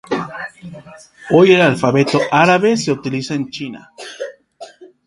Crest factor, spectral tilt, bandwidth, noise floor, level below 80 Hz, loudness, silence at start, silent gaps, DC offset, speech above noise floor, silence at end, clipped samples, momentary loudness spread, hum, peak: 16 dB; -5.5 dB/octave; 11.5 kHz; -39 dBFS; -56 dBFS; -14 LUFS; 0.1 s; none; under 0.1%; 24 dB; 0.2 s; under 0.1%; 23 LU; none; 0 dBFS